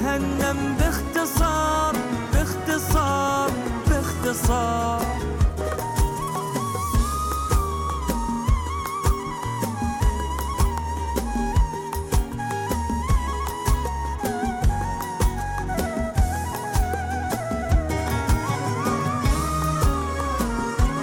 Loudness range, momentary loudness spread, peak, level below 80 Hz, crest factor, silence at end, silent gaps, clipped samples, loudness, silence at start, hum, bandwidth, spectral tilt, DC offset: 3 LU; 5 LU; -10 dBFS; -28 dBFS; 12 dB; 0 s; none; under 0.1%; -24 LUFS; 0 s; none; 18 kHz; -5.5 dB/octave; under 0.1%